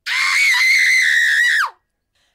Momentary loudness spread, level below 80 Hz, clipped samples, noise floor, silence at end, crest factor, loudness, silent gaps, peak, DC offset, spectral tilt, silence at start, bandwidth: 5 LU; -72 dBFS; under 0.1%; -66 dBFS; 0.65 s; 12 dB; -12 LUFS; none; -6 dBFS; under 0.1%; 5 dB/octave; 0.05 s; 16 kHz